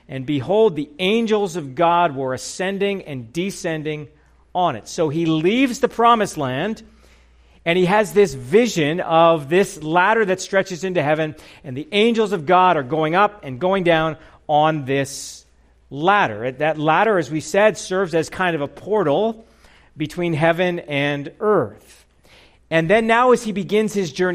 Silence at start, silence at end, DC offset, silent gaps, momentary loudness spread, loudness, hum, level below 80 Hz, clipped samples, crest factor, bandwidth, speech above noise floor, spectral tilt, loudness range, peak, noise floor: 0.1 s; 0 s; under 0.1%; none; 11 LU; -19 LUFS; none; -52 dBFS; under 0.1%; 16 dB; 15.5 kHz; 35 dB; -5 dB/octave; 4 LU; -2 dBFS; -53 dBFS